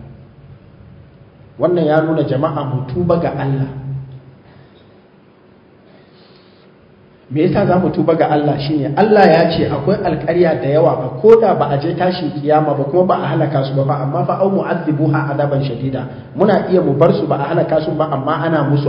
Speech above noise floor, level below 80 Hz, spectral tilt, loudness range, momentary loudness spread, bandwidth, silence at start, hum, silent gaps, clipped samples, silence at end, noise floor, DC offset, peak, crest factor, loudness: 32 dB; -46 dBFS; -10 dB/octave; 9 LU; 9 LU; 5.4 kHz; 0 s; none; none; under 0.1%; 0 s; -46 dBFS; under 0.1%; 0 dBFS; 16 dB; -15 LUFS